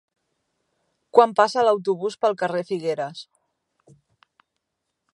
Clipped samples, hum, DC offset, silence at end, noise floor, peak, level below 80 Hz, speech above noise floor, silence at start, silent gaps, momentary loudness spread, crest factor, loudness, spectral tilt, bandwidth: under 0.1%; none; under 0.1%; 1.9 s; -80 dBFS; 0 dBFS; -78 dBFS; 59 dB; 1.15 s; none; 11 LU; 24 dB; -21 LUFS; -5 dB/octave; 11 kHz